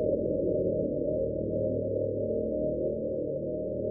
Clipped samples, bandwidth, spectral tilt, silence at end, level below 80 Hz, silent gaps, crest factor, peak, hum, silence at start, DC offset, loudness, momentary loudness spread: under 0.1%; 0.8 kHz; -11 dB/octave; 0 s; -50 dBFS; none; 14 dB; -16 dBFS; none; 0 s; under 0.1%; -31 LUFS; 4 LU